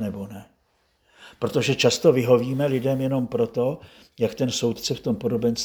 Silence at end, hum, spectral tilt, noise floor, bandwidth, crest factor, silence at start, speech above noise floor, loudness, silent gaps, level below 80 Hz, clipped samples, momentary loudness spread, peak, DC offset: 0 s; none; -5 dB/octave; -67 dBFS; over 20 kHz; 20 dB; 0 s; 44 dB; -23 LUFS; none; -58 dBFS; under 0.1%; 13 LU; -4 dBFS; under 0.1%